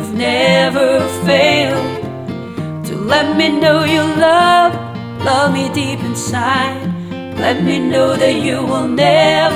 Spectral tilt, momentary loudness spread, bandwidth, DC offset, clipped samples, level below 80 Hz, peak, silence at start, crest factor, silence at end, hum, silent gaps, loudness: -5 dB/octave; 13 LU; 18.5 kHz; under 0.1%; under 0.1%; -50 dBFS; 0 dBFS; 0 s; 14 dB; 0 s; none; none; -13 LUFS